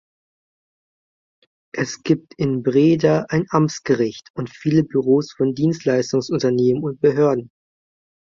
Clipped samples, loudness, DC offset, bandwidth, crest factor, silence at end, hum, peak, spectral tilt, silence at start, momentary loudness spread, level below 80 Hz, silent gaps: under 0.1%; -19 LUFS; under 0.1%; 7.6 kHz; 18 dB; 0.9 s; none; -2 dBFS; -7 dB/octave; 1.75 s; 9 LU; -58 dBFS; 4.30-4.34 s